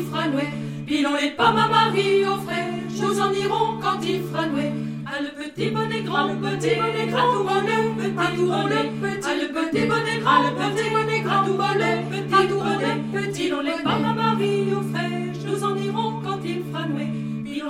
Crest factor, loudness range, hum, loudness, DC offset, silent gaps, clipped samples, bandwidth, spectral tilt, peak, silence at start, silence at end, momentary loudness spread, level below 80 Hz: 18 dB; 4 LU; none; -22 LUFS; under 0.1%; none; under 0.1%; 16 kHz; -5.5 dB/octave; -4 dBFS; 0 s; 0 s; 8 LU; -60 dBFS